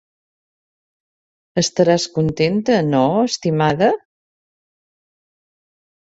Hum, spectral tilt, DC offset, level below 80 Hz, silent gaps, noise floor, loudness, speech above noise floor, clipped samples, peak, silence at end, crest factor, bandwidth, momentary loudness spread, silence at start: none; -5.5 dB/octave; under 0.1%; -54 dBFS; none; under -90 dBFS; -17 LUFS; over 74 dB; under 0.1%; -2 dBFS; 2.05 s; 18 dB; 8 kHz; 5 LU; 1.55 s